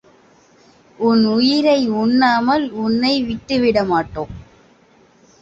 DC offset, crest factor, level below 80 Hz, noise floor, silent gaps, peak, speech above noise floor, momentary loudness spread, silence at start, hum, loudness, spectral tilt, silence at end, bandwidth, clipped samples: under 0.1%; 14 dB; -48 dBFS; -52 dBFS; none; -2 dBFS; 36 dB; 7 LU; 1 s; none; -16 LUFS; -6 dB/octave; 1 s; 8 kHz; under 0.1%